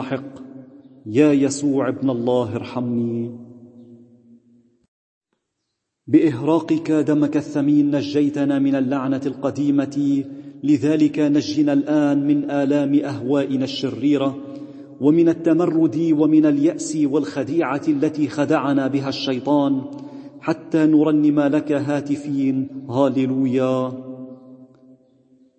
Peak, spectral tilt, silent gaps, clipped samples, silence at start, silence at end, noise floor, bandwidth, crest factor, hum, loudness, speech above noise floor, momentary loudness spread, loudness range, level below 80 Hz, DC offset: -4 dBFS; -6.5 dB/octave; 4.88-5.21 s; under 0.1%; 0 s; 0.95 s; -77 dBFS; 8.6 kHz; 16 dB; none; -19 LUFS; 59 dB; 12 LU; 5 LU; -66 dBFS; under 0.1%